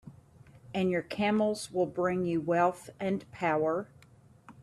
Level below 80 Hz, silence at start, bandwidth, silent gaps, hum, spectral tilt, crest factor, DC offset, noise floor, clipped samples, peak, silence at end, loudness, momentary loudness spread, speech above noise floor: -68 dBFS; 0.05 s; 13 kHz; none; none; -6 dB/octave; 18 dB; under 0.1%; -58 dBFS; under 0.1%; -14 dBFS; 0 s; -31 LUFS; 8 LU; 29 dB